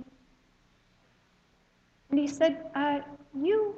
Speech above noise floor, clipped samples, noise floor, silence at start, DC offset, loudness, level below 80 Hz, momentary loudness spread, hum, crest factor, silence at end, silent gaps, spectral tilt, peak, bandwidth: 38 dB; under 0.1%; -66 dBFS; 0 s; under 0.1%; -29 LUFS; -70 dBFS; 7 LU; none; 18 dB; 0 s; none; -4.5 dB/octave; -14 dBFS; 8.2 kHz